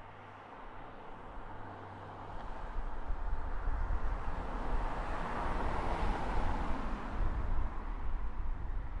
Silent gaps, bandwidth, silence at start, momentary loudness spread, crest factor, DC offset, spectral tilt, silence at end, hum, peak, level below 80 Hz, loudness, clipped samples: none; 6.4 kHz; 0 s; 13 LU; 14 dB; under 0.1%; -7 dB/octave; 0 s; none; -20 dBFS; -38 dBFS; -41 LUFS; under 0.1%